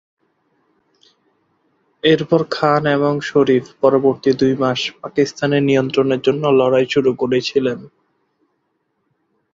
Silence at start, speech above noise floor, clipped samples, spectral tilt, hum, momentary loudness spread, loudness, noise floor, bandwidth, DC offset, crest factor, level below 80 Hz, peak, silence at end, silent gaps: 2.05 s; 53 dB; under 0.1%; -6 dB/octave; none; 5 LU; -16 LUFS; -69 dBFS; 7.6 kHz; under 0.1%; 16 dB; -58 dBFS; -2 dBFS; 1.65 s; none